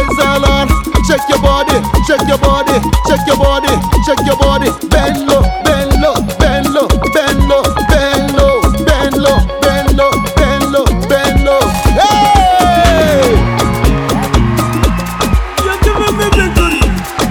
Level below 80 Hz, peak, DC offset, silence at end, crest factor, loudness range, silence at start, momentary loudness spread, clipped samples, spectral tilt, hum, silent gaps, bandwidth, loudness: -16 dBFS; 0 dBFS; under 0.1%; 0 s; 10 dB; 2 LU; 0 s; 4 LU; under 0.1%; -5 dB/octave; none; none; 18.5 kHz; -11 LUFS